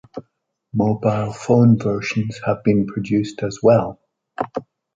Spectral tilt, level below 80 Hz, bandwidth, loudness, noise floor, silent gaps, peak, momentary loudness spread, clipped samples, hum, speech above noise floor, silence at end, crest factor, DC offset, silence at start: -8 dB/octave; -52 dBFS; 7.8 kHz; -19 LUFS; -68 dBFS; none; -2 dBFS; 15 LU; under 0.1%; none; 50 dB; 0.35 s; 18 dB; under 0.1%; 0.15 s